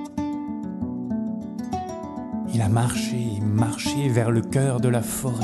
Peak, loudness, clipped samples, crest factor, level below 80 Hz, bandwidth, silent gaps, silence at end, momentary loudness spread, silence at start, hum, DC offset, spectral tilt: -6 dBFS; -25 LUFS; under 0.1%; 18 dB; -48 dBFS; 12.5 kHz; none; 0 s; 9 LU; 0 s; none; under 0.1%; -6 dB/octave